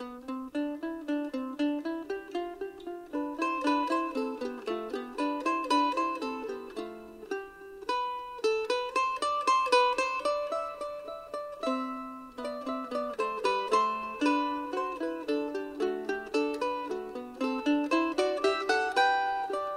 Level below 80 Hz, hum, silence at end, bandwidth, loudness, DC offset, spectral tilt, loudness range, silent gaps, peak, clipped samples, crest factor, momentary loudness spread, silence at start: -66 dBFS; 60 Hz at -70 dBFS; 0 s; 15 kHz; -31 LUFS; under 0.1%; -3 dB/octave; 5 LU; none; -10 dBFS; under 0.1%; 20 dB; 12 LU; 0 s